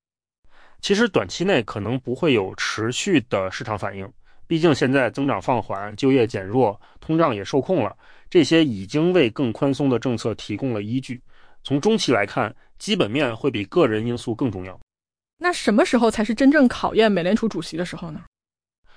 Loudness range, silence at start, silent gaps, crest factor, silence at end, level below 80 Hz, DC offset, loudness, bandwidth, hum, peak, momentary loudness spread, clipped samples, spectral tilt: 3 LU; 0.85 s; 14.82-14.87 s, 15.33-15.37 s; 16 dB; 0.75 s; -52 dBFS; under 0.1%; -21 LUFS; 10.5 kHz; none; -6 dBFS; 11 LU; under 0.1%; -5.5 dB/octave